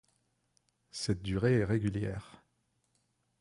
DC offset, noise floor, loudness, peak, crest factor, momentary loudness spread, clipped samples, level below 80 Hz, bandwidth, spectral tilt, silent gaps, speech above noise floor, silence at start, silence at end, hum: under 0.1%; -77 dBFS; -32 LUFS; -16 dBFS; 18 dB; 13 LU; under 0.1%; -54 dBFS; 11.5 kHz; -6.5 dB/octave; none; 46 dB; 0.95 s; 1.15 s; none